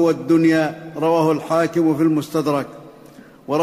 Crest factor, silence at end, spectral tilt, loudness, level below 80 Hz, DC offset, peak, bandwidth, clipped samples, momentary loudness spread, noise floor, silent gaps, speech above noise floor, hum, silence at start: 12 dB; 0 s; -7 dB/octave; -18 LUFS; -60 dBFS; under 0.1%; -6 dBFS; 15 kHz; under 0.1%; 9 LU; -44 dBFS; none; 26 dB; none; 0 s